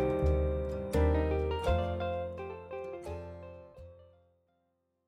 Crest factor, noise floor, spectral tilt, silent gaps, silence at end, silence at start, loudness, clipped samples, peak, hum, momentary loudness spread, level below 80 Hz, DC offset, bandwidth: 16 dB; -78 dBFS; -8 dB/octave; none; 1.05 s; 0 s; -33 LUFS; under 0.1%; -16 dBFS; none; 19 LU; -38 dBFS; under 0.1%; 12 kHz